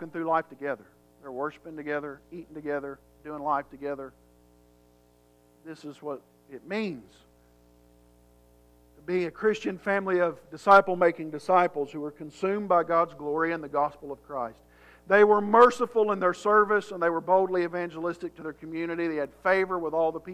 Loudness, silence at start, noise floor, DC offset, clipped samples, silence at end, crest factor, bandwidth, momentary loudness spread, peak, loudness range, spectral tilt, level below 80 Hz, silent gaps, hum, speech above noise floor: -26 LUFS; 0 s; -61 dBFS; under 0.1%; under 0.1%; 0 s; 22 dB; 13 kHz; 20 LU; -6 dBFS; 17 LU; -6 dB/octave; -64 dBFS; none; 60 Hz at -60 dBFS; 35 dB